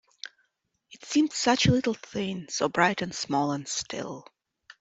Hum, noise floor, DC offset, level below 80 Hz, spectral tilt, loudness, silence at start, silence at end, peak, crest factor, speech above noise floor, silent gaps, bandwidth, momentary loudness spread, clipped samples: none; -75 dBFS; under 0.1%; -56 dBFS; -4 dB/octave; -27 LUFS; 0.25 s; 0.6 s; -4 dBFS; 24 dB; 48 dB; none; 8.2 kHz; 21 LU; under 0.1%